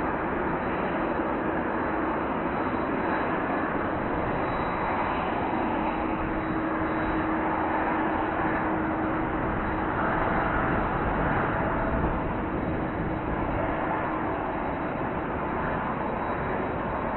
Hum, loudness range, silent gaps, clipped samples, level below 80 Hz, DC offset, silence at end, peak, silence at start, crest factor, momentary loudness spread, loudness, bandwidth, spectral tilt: none; 2 LU; none; under 0.1%; -40 dBFS; under 0.1%; 0 s; -12 dBFS; 0 s; 16 dB; 3 LU; -28 LUFS; 4.2 kHz; -10.5 dB/octave